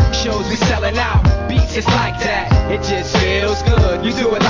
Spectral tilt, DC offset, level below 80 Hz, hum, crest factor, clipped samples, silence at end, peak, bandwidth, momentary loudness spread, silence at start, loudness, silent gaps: -5.5 dB/octave; under 0.1%; -20 dBFS; none; 14 dB; under 0.1%; 0 s; 0 dBFS; 7.6 kHz; 3 LU; 0 s; -16 LUFS; none